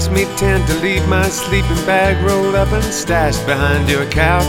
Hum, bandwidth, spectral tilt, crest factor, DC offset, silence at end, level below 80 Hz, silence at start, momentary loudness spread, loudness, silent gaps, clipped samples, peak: none; 17 kHz; -5 dB/octave; 14 dB; under 0.1%; 0 s; -22 dBFS; 0 s; 3 LU; -15 LUFS; none; under 0.1%; 0 dBFS